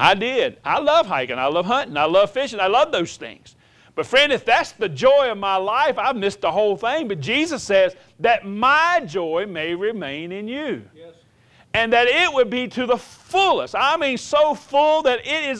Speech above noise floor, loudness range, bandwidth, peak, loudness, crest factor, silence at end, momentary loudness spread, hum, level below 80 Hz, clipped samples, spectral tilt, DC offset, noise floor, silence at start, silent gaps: 35 dB; 3 LU; 11 kHz; 0 dBFS; -19 LUFS; 20 dB; 0 s; 10 LU; none; -56 dBFS; under 0.1%; -3.5 dB/octave; under 0.1%; -54 dBFS; 0 s; none